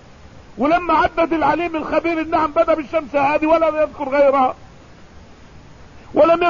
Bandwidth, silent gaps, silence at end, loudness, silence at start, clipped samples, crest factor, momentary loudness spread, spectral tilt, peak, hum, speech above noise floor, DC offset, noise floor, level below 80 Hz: 7.2 kHz; none; 0 s; -17 LUFS; 0.35 s; under 0.1%; 14 dB; 6 LU; -6.5 dB/octave; -4 dBFS; none; 26 dB; 0.3%; -43 dBFS; -44 dBFS